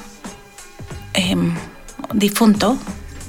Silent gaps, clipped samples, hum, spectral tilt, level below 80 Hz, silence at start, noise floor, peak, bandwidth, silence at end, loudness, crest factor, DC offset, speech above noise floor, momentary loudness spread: none; under 0.1%; none; -5 dB/octave; -40 dBFS; 0 s; -39 dBFS; -4 dBFS; 18 kHz; 0 s; -18 LUFS; 18 dB; under 0.1%; 23 dB; 22 LU